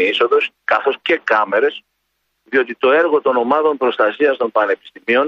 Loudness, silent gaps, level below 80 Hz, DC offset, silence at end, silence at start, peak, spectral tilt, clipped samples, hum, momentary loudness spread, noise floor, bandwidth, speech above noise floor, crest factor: -16 LUFS; none; -70 dBFS; under 0.1%; 0 s; 0 s; -2 dBFS; -5 dB/octave; under 0.1%; none; 5 LU; -70 dBFS; 6.8 kHz; 54 dB; 14 dB